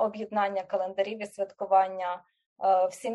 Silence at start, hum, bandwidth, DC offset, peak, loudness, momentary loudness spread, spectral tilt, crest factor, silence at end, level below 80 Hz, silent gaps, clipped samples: 0 s; none; 12 kHz; under 0.1%; -12 dBFS; -28 LUFS; 10 LU; -4.5 dB/octave; 16 dB; 0 s; -82 dBFS; 2.46-2.56 s; under 0.1%